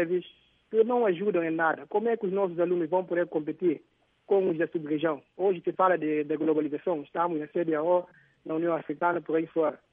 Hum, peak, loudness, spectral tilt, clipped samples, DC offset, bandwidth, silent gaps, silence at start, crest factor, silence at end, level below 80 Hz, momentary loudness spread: none; -10 dBFS; -28 LUFS; -10.5 dB/octave; under 0.1%; under 0.1%; 3.8 kHz; none; 0 s; 16 dB; 0.15 s; -78 dBFS; 5 LU